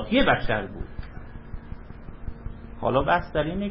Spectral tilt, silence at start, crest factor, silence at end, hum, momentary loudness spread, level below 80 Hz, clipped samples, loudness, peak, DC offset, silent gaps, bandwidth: -10 dB/octave; 0 s; 20 dB; 0 s; none; 21 LU; -38 dBFS; under 0.1%; -24 LUFS; -6 dBFS; under 0.1%; none; 5.8 kHz